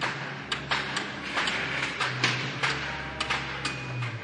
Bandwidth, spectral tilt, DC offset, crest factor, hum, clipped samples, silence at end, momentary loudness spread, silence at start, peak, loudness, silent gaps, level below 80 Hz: 11 kHz; -3 dB/octave; under 0.1%; 22 dB; none; under 0.1%; 0 s; 6 LU; 0 s; -10 dBFS; -29 LUFS; none; -54 dBFS